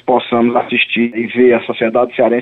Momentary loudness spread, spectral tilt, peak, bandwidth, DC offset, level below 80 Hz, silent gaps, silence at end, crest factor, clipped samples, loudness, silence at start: 4 LU; -8 dB/octave; -2 dBFS; 4.1 kHz; under 0.1%; -58 dBFS; none; 0 s; 12 dB; under 0.1%; -13 LUFS; 0.05 s